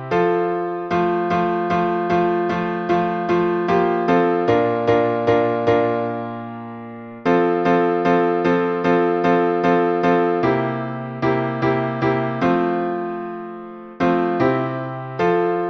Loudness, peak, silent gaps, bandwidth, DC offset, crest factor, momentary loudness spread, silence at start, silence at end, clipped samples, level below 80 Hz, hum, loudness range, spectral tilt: -19 LUFS; -4 dBFS; none; 6.2 kHz; under 0.1%; 16 dB; 10 LU; 0 s; 0 s; under 0.1%; -54 dBFS; none; 4 LU; -8 dB/octave